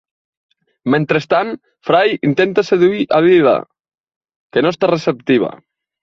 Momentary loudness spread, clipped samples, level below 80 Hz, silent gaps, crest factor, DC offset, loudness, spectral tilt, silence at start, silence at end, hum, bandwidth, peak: 9 LU; under 0.1%; -58 dBFS; 4.00-4.04 s, 4.16-4.21 s, 4.36-4.50 s; 16 dB; under 0.1%; -15 LUFS; -7 dB/octave; 0.85 s; 0.45 s; none; 7.2 kHz; 0 dBFS